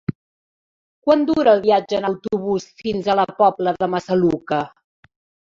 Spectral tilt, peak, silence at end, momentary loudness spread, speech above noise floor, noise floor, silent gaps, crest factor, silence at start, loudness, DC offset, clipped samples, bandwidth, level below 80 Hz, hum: -6.5 dB/octave; -2 dBFS; 0.8 s; 9 LU; over 72 dB; under -90 dBFS; 0.15-1.02 s; 18 dB; 0.1 s; -19 LUFS; under 0.1%; under 0.1%; 7.6 kHz; -56 dBFS; none